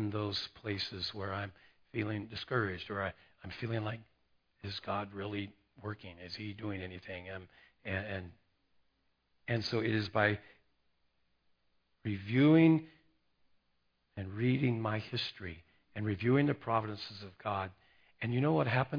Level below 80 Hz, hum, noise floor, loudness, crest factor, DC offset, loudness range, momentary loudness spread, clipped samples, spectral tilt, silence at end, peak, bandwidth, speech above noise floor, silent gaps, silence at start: -68 dBFS; none; -77 dBFS; -35 LUFS; 22 dB; under 0.1%; 11 LU; 17 LU; under 0.1%; -5 dB/octave; 0 s; -14 dBFS; 5.2 kHz; 43 dB; none; 0 s